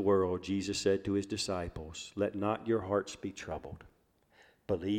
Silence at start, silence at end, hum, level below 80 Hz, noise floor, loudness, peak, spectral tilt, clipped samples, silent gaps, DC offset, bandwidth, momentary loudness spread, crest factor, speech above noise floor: 0 s; 0 s; none; -58 dBFS; -67 dBFS; -35 LUFS; -16 dBFS; -5 dB/octave; under 0.1%; none; under 0.1%; 15 kHz; 12 LU; 18 dB; 34 dB